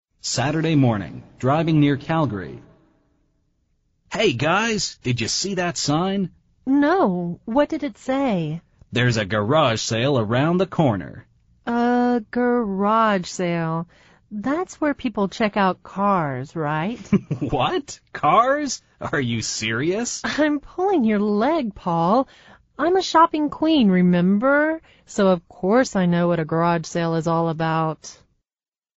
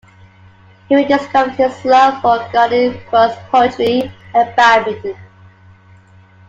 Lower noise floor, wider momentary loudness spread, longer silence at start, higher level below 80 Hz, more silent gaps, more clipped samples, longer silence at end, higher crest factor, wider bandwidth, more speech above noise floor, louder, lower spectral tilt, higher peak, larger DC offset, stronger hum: first, under -90 dBFS vs -44 dBFS; about the same, 10 LU vs 8 LU; second, 0.25 s vs 0.9 s; about the same, -52 dBFS vs -54 dBFS; neither; neither; second, 0.85 s vs 1.25 s; about the same, 16 dB vs 14 dB; about the same, 8 kHz vs 7.8 kHz; first, over 70 dB vs 31 dB; second, -21 LUFS vs -13 LUFS; about the same, -5 dB/octave vs -5 dB/octave; second, -4 dBFS vs 0 dBFS; neither; neither